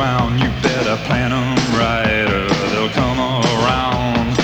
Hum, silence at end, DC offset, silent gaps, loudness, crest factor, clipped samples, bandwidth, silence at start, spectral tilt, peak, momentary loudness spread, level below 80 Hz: none; 0 s; under 0.1%; none; -16 LUFS; 14 dB; under 0.1%; 19.5 kHz; 0 s; -5.5 dB/octave; -2 dBFS; 2 LU; -32 dBFS